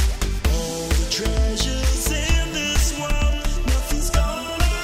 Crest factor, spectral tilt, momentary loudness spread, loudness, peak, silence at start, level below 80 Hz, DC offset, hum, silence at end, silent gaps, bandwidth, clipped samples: 14 dB; -4 dB/octave; 3 LU; -22 LUFS; -6 dBFS; 0 s; -22 dBFS; under 0.1%; none; 0 s; none; 16 kHz; under 0.1%